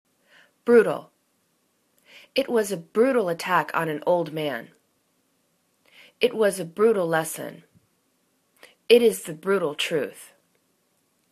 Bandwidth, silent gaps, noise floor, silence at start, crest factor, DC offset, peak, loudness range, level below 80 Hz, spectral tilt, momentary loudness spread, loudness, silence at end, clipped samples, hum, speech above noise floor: 14 kHz; none; -69 dBFS; 0.65 s; 22 dB; under 0.1%; -2 dBFS; 3 LU; -74 dBFS; -4.5 dB/octave; 13 LU; -23 LUFS; 1.05 s; under 0.1%; none; 47 dB